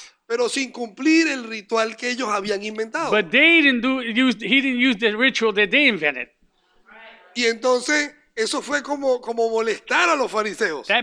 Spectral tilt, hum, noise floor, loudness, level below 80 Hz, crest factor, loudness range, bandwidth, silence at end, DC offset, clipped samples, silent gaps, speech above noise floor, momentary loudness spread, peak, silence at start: -2.5 dB/octave; none; -60 dBFS; -19 LUFS; -64 dBFS; 18 dB; 6 LU; 11 kHz; 0 s; under 0.1%; under 0.1%; none; 40 dB; 10 LU; -2 dBFS; 0 s